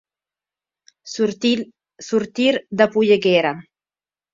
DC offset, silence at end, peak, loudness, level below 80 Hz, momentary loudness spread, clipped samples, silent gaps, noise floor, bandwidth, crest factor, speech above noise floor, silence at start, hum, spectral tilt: under 0.1%; 0.7 s; 0 dBFS; -19 LUFS; -64 dBFS; 18 LU; under 0.1%; none; under -90 dBFS; 7.6 kHz; 20 dB; over 72 dB; 1.05 s; 50 Hz at -45 dBFS; -5 dB/octave